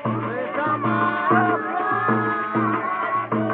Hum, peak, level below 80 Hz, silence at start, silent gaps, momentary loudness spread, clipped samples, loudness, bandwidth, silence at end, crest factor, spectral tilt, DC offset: none; -4 dBFS; -68 dBFS; 0 s; none; 5 LU; under 0.1%; -22 LUFS; 4.6 kHz; 0 s; 16 dB; -5.5 dB/octave; under 0.1%